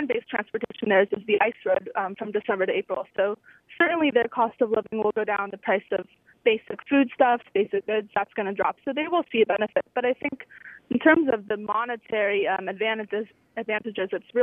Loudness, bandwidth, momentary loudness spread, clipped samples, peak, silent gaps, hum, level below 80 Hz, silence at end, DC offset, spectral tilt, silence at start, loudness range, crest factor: -25 LUFS; 3.8 kHz; 9 LU; under 0.1%; -4 dBFS; none; none; -70 dBFS; 0 s; under 0.1%; -8 dB/octave; 0 s; 1 LU; 20 dB